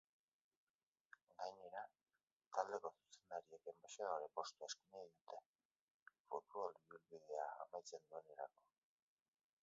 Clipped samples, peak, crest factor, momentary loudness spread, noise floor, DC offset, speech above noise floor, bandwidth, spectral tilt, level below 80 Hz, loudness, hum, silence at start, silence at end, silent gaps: under 0.1%; -26 dBFS; 28 dB; 14 LU; under -90 dBFS; under 0.1%; over 39 dB; 7.4 kHz; 0 dB/octave; under -90 dBFS; -52 LUFS; none; 1.4 s; 1.15 s; 2.32-2.40 s, 5.21-5.25 s, 5.46-5.59 s, 5.65-5.70 s, 5.76-6.06 s, 6.20-6.25 s